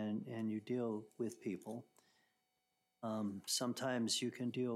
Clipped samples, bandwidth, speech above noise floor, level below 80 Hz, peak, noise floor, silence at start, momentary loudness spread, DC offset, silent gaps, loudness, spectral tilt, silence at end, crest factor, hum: under 0.1%; 16 kHz; 44 dB; under -90 dBFS; -24 dBFS; -85 dBFS; 0 s; 9 LU; under 0.1%; none; -41 LUFS; -4 dB/octave; 0 s; 18 dB; none